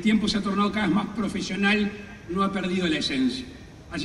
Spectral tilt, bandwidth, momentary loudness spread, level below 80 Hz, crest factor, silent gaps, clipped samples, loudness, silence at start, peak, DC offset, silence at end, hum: -5 dB/octave; 11.5 kHz; 13 LU; -48 dBFS; 14 dB; none; under 0.1%; -25 LUFS; 0 s; -12 dBFS; under 0.1%; 0 s; none